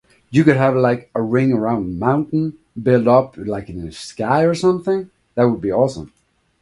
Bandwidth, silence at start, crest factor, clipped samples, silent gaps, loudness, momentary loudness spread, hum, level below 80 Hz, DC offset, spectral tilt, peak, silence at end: 11.5 kHz; 0.3 s; 18 dB; under 0.1%; none; -18 LUFS; 13 LU; none; -48 dBFS; under 0.1%; -7.5 dB/octave; 0 dBFS; 0.55 s